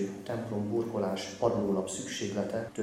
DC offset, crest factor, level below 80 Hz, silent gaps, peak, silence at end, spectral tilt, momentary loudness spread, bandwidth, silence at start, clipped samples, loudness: under 0.1%; 18 dB; -64 dBFS; none; -14 dBFS; 0 s; -5 dB/octave; 5 LU; 15 kHz; 0 s; under 0.1%; -33 LUFS